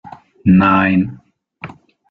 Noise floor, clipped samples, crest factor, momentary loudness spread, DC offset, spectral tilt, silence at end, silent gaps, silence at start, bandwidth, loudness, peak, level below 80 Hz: -36 dBFS; under 0.1%; 14 dB; 24 LU; under 0.1%; -9.5 dB/octave; 0.4 s; none; 0.05 s; 4.4 kHz; -14 LUFS; -2 dBFS; -48 dBFS